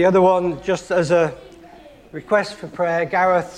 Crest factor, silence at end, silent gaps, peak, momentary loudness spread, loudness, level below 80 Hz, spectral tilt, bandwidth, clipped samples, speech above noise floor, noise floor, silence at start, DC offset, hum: 14 dB; 0 s; none; -4 dBFS; 16 LU; -19 LUFS; -52 dBFS; -6 dB/octave; 10.5 kHz; under 0.1%; 26 dB; -44 dBFS; 0 s; under 0.1%; none